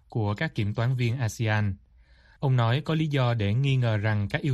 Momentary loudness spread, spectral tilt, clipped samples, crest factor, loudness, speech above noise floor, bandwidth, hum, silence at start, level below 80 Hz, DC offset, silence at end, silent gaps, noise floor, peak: 4 LU; -7 dB/octave; under 0.1%; 16 dB; -26 LUFS; 31 dB; 12 kHz; none; 0.1 s; -54 dBFS; under 0.1%; 0 s; none; -56 dBFS; -10 dBFS